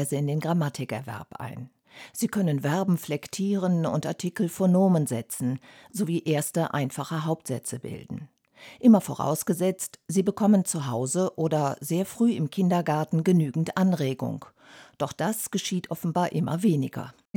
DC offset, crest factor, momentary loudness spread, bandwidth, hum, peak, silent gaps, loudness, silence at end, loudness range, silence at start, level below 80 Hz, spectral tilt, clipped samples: under 0.1%; 18 dB; 15 LU; 19 kHz; none; -8 dBFS; none; -26 LUFS; 0.25 s; 4 LU; 0 s; -70 dBFS; -6 dB/octave; under 0.1%